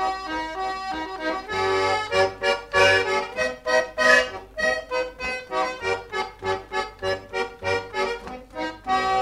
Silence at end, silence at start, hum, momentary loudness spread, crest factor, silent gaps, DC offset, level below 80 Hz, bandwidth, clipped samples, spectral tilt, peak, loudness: 0 s; 0 s; none; 12 LU; 20 dB; none; under 0.1%; -50 dBFS; 15 kHz; under 0.1%; -3 dB/octave; -4 dBFS; -24 LUFS